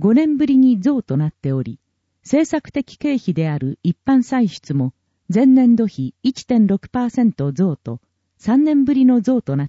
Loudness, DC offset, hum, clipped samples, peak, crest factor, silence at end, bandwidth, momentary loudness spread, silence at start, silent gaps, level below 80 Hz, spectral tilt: -17 LUFS; under 0.1%; none; under 0.1%; -6 dBFS; 12 dB; 0 s; 8 kHz; 10 LU; 0 s; none; -54 dBFS; -8 dB/octave